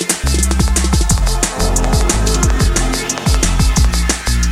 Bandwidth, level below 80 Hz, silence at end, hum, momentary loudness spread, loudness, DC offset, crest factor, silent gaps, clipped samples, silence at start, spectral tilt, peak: 15.5 kHz; -16 dBFS; 0 s; none; 2 LU; -15 LUFS; under 0.1%; 14 dB; none; under 0.1%; 0 s; -4 dB/octave; 0 dBFS